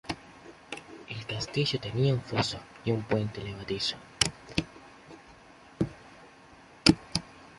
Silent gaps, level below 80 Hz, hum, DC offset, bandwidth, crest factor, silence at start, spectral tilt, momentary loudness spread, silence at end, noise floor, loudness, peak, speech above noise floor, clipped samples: none; -54 dBFS; none; under 0.1%; 11.5 kHz; 30 dB; 0.05 s; -4.5 dB/octave; 25 LU; 0.05 s; -54 dBFS; -30 LUFS; -2 dBFS; 23 dB; under 0.1%